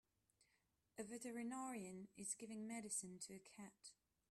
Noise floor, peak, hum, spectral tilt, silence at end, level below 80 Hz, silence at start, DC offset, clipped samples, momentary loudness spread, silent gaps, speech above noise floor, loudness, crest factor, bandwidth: -85 dBFS; -34 dBFS; none; -3.5 dB/octave; 0.35 s; -88 dBFS; 0.95 s; under 0.1%; under 0.1%; 13 LU; none; 33 dB; -51 LUFS; 20 dB; 14.5 kHz